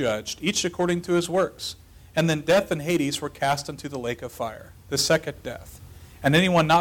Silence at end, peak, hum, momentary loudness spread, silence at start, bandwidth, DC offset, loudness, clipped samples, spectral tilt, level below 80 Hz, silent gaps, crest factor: 0 s; -10 dBFS; none; 14 LU; 0 s; 19 kHz; under 0.1%; -24 LUFS; under 0.1%; -4.5 dB/octave; -52 dBFS; none; 16 dB